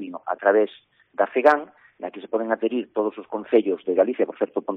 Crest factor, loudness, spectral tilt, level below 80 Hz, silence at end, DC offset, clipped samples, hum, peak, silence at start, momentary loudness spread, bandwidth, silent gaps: 18 dB; -23 LUFS; -3.5 dB/octave; -74 dBFS; 0 s; under 0.1%; under 0.1%; none; -4 dBFS; 0 s; 16 LU; 4.5 kHz; none